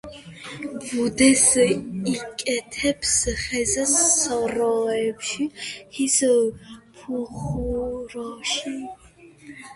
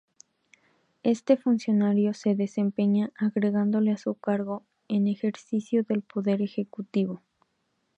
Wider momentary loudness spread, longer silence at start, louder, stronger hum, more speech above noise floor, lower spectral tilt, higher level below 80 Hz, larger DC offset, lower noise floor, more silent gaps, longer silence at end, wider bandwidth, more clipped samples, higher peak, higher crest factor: first, 17 LU vs 7 LU; second, 0.05 s vs 1.05 s; first, -21 LUFS vs -27 LUFS; neither; second, 24 dB vs 49 dB; second, -2.5 dB/octave vs -8 dB/octave; first, -46 dBFS vs -78 dBFS; neither; second, -47 dBFS vs -75 dBFS; neither; second, 0 s vs 0.8 s; first, 11.5 kHz vs 8 kHz; neither; first, -2 dBFS vs -8 dBFS; about the same, 22 dB vs 18 dB